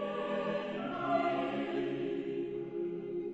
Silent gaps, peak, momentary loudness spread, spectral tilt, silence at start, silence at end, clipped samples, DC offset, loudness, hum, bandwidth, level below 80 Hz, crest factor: none; -20 dBFS; 7 LU; -7.5 dB/octave; 0 s; 0 s; under 0.1%; under 0.1%; -36 LUFS; none; 8 kHz; -70 dBFS; 16 dB